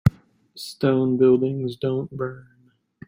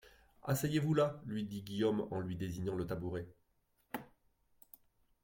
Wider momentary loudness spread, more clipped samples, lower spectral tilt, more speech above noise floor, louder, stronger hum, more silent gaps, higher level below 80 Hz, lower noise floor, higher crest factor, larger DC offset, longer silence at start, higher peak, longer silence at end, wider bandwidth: about the same, 14 LU vs 15 LU; neither; first, -8 dB/octave vs -6.5 dB/octave; second, 28 dB vs 40 dB; first, -22 LUFS vs -38 LUFS; neither; neither; first, -46 dBFS vs -64 dBFS; second, -49 dBFS vs -77 dBFS; about the same, 20 dB vs 20 dB; neither; about the same, 0.05 s vs 0.05 s; first, -4 dBFS vs -20 dBFS; second, 0.65 s vs 1.2 s; about the same, 16 kHz vs 16.5 kHz